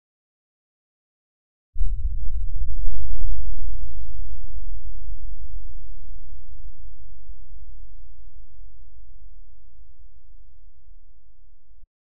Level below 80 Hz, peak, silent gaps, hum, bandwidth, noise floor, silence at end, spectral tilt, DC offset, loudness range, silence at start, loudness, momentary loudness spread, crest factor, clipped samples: -32 dBFS; -2 dBFS; none; none; 1.6 kHz; -53 dBFS; 0.25 s; -20.5 dB/octave; under 0.1%; 19 LU; 1.75 s; -37 LUFS; 24 LU; 14 dB; under 0.1%